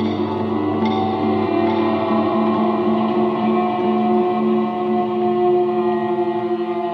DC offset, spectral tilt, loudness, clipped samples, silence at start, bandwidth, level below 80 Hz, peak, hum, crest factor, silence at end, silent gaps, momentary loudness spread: under 0.1%; -9 dB/octave; -19 LUFS; under 0.1%; 0 s; 5.6 kHz; -62 dBFS; -6 dBFS; none; 12 dB; 0 s; none; 4 LU